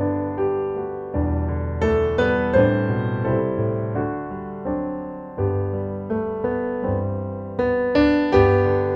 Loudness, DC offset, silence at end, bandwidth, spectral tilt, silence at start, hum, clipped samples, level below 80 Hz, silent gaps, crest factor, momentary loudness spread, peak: -22 LUFS; under 0.1%; 0 s; 7.2 kHz; -9 dB/octave; 0 s; none; under 0.1%; -36 dBFS; none; 18 dB; 11 LU; -2 dBFS